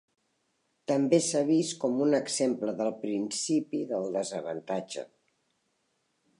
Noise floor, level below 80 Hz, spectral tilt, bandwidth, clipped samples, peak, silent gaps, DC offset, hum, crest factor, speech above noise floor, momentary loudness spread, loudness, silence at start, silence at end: -76 dBFS; -82 dBFS; -4.5 dB/octave; 11.5 kHz; under 0.1%; -10 dBFS; none; under 0.1%; none; 20 dB; 47 dB; 10 LU; -29 LUFS; 0.9 s; 1.35 s